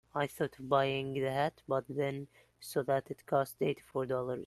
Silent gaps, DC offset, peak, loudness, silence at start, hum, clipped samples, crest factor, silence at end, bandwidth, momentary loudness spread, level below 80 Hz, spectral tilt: none; under 0.1%; -14 dBFS; -35 LUFS; 0.15 s; none; under 0.1%; 20 dB; 0 s; 13 kHz; 7 LU; -70 dBFS; -6 dB/octave